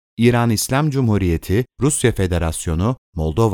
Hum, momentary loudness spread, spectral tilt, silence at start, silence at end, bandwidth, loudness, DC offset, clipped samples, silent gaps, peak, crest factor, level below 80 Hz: none; 5 LU; -5.5 dB/octave; 0.2 s; 0 s; 18.5 kHz; -18 LUFS; under 0.1%; under 0.1%; 2.98-3.13 s; 0 dBFS; 18 dB; -36 dBFS